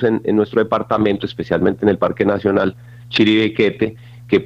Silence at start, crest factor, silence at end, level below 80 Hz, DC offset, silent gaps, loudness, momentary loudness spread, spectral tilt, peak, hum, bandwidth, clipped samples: 0 s; 14 dB; 0 s; -50 dBFS; under 0.1%; none; -17 LUFS; 8 LU; -7.5 dB/octave; -2 dBFS; none; 7.6 kHz; under 0.1%